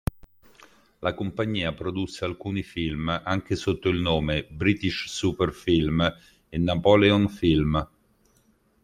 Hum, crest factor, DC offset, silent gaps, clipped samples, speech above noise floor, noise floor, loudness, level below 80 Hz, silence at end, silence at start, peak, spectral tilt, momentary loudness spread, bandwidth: none; 20 dB; under 0.1%; none; under 0.1%; 39 dB; -64 dBFS; -25 LUFS; -44 dBFS; 1 s; 1 s; -4 dBFS; -6 dB/octave; 11 LU; 16.5 kHz